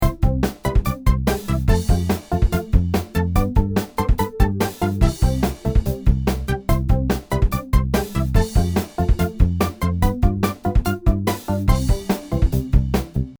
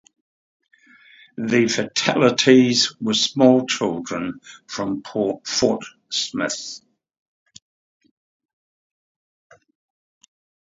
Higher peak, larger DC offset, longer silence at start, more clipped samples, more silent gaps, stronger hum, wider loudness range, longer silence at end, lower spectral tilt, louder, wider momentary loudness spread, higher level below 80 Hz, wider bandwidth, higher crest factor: about the same, -2 dBFS vs 0 dBFS; neither; second, 0 s vs 1.4 s; neither; neither; neither; second, 1 LU vs 13 LU; second, 0.05 s vs 4 s; first, -7 dB/octave vs -3.5 dB/octave; about the same, -21 LUFS vs -19 LUFS; second, 3 LU vs 16 LU; first, -22 dBFS vs -62 dBFS; first, over 20 kHz vs 8 kHz; about the same, 18 dB vs 22 dB